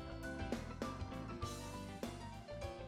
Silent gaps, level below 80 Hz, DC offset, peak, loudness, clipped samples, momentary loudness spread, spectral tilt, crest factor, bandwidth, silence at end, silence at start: none; -54 dBFS; under 0.1%; -28 dBFS; -47 LUFS; under 0.1%; 4 LU; -5.5 dB/octave; 18 dB; 16 kHz; 0 s; 0 s